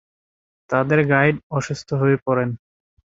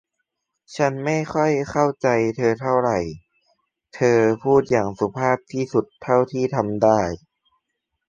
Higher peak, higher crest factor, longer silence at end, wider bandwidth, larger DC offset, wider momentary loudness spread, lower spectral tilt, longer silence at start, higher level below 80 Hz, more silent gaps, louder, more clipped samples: about the same, -2 dBFS vs -2 dBFS; about the same, 20 dB vs 20 dB; second, 0.6 s vs 0.9 s; second, 7.8 kHz vs 9 kHz; neither; first, 9 LU vs 6 LU; about the same, -7 dB/octave vs -6.5 dB/octave; about the same, 0.7 s vs 0.7 s; about the same, -56 dBFS vs -52 dBFS; first, 1.43-1.50 s, 2.22-2.26 s vs none; about the same, -20 LUFS vs -21 LUFS; neither